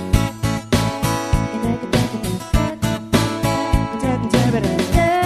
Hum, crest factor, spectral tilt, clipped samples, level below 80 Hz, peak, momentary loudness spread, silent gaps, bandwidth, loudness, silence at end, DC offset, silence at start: none; 18 dB; -5.5 dB/octave; under 0.1%; -26 dBFS; 0 dBFS; 5 LU; none; 14 kHz; -19 LUFS; 0 s; 0.1%; 0 s